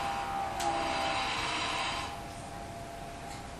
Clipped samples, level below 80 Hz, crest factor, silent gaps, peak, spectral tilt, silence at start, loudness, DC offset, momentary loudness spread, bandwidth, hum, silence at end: under 0.1%; -52 dBFS; 16 dB; none; -20 dBFS; -3 dB/octave; 0 s; -34 LUFS; under 0.1%; 12 LU; 15 kHz; none; 0 s